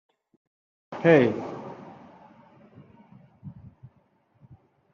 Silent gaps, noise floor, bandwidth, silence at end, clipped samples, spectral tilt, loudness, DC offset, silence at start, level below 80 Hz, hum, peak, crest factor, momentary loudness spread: none; -65 dBFS; 6.8 kHz; 1.4 s; under 0.1%; -6 dB/octave; -22 LUFS; under 0.1%; 0.9 s; -70 dBFS; none; -4 dBFS; 26 dB; 28 LU